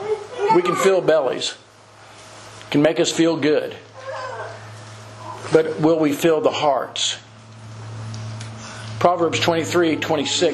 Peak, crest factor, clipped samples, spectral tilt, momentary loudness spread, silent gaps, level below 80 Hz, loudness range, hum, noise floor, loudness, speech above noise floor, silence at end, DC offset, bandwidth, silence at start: 0 dBFS; 20 dB; under 0.1%; -4.5 dB/octave; 20 LU; none; -60 dBFS; 2 LU; none; -46 dBFS; -19 LUFS; 28 dB; 0 s; under 0.1%; 13 kHz; 0 s